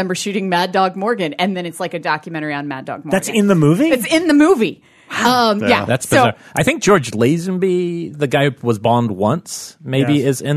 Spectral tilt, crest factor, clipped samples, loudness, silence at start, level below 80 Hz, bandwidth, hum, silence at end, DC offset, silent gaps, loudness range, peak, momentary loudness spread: -5 dB/octave; 14 dB; under 0.1%; -16 LUFS; 0 s; -52 dBFS; 13.5 kHz; none; 0 s; under 0.1%; none; 4 LU; -2 dBFS; 10 LU